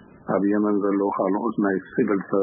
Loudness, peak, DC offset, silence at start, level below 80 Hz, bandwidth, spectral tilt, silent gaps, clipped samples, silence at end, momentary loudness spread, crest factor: -23 LUFS; -8 dBFS; under 0.1%; 0.25 s; -66 dBFS; 3.6 kHz; -13 dB/octave; none; under 0.1%; 0 s; 3 LU; 16 dB